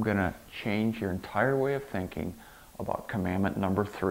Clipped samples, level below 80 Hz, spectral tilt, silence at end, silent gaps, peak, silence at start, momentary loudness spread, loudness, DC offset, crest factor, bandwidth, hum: under 0.1%; -54 dBFS; -7 dB/octave; 0 s; none; -12 dBFS; 0 s; 11 LU; -31 LUFS; under 0.1%; 18 dB; 16 kHz; none